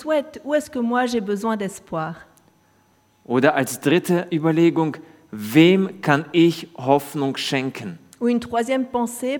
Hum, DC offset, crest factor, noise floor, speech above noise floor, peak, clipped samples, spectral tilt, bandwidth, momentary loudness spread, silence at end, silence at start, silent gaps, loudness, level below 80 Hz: none; under 0.1%; 20 dB; -59 dBFS; 39 dB; 0 dBFS; under 0.1%; -5.5 dB/octave; 19 kHz; 12 LU; 0 s; 0 s; none; -20 LUFS; -64 dBFS